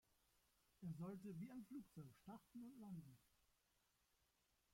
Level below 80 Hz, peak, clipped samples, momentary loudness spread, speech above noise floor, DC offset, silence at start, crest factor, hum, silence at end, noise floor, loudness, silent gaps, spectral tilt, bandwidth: -86 dBFS; -44 dBFS; under 0.1%; 8 LU; 28 dB; under 0.1%; 0.8 s; 16 dB; none; 1.5 s; -85 dBFS; -58 LUFS; none; -8 dB/octave; 16.5 kHz